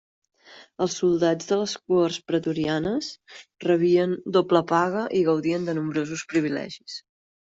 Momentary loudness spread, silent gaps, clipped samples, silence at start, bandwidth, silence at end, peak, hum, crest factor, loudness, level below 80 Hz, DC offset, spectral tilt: 11 LU; none; under 0.1%; 0.5 s; 8 kHz; 0.4 s; -6 dBFS; none; 18 dB; -24 LUFS; -64 dBFS; under 0.1%; -5.5 dB/octave